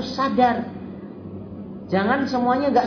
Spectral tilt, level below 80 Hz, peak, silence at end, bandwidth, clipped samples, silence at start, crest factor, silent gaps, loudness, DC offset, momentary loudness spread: -6.5 dB/octave; -56 dBFS; -6 dBFS; 0 s; 5.4 kHz; under 0.1%; 0 s; 18 dB; none; -21 LUFS; under 0.1%; 17 LU